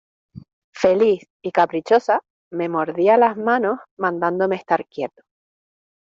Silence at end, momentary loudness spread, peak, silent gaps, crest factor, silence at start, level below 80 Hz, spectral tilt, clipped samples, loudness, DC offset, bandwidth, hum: 1 s; 10 LU; -2 dBFS; 0.53-0.73 s, 1.30-1.40 s, 2.30-2.51 s, 3.91-3.97 s; 18 dB; 0.35 s; -64 dBFS; -6.5 dB/octave; under 0.1%; -20 LUFS; under 0.1%; 7.6 kHz; none